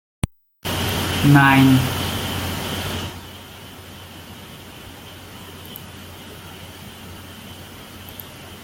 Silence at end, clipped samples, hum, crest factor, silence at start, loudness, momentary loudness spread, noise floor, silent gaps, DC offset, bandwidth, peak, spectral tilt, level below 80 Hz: 0 s; under 0.1%; none; 22 dB; 0.65 s; -19 LUFS; 24 LU; -39 dBFS; none; under 0.1%; 17 kHz; -2 dBFS; -5 dB/octave; -44 dBFS